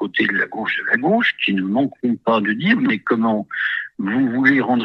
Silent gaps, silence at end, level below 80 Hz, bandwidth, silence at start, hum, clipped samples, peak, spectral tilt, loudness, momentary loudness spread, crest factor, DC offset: none; 0 s; -64 dBFS; 6 kHz; 0 s; none; under 0.1%; -2 dBFS; -7.5 dB/octave; -18 LUFS; 6 LU; 16 dB; under 0.1%